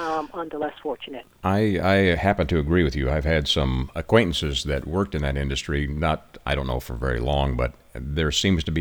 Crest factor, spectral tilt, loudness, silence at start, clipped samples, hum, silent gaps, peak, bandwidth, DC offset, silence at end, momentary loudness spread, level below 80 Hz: 20 dB; -5.5 dB/octave; -24 LUFS; 0 s; under 0.1%; none; none; -4 dBFS; 19 kHz; under 0.1%; 0 s; 10 LU; -32 dBFS